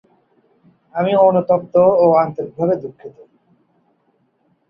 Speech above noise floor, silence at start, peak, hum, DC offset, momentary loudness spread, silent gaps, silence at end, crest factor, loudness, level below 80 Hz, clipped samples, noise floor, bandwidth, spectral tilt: 48 dB; 0.95 s; -2 dBFS; none; under 0.1%; 11 LU; none; 1.6 s; 16 dB; -15 LUFS; -60 dBFS; under 0.1%; -63 dBFS; 5.2 kHz; -10 dB/octave